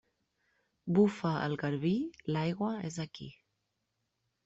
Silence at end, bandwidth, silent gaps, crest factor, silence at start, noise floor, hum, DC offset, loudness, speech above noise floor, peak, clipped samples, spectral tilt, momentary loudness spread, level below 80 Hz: 1.15 s; 8 kHz; none; 20 dB; 0.85 s; -83 dBFS; none; under 0.1%; -33 LUFS; 51 dB; -14 dBFS; under 0.1%; -7 dB/octave; 16 LU; -70 dBFS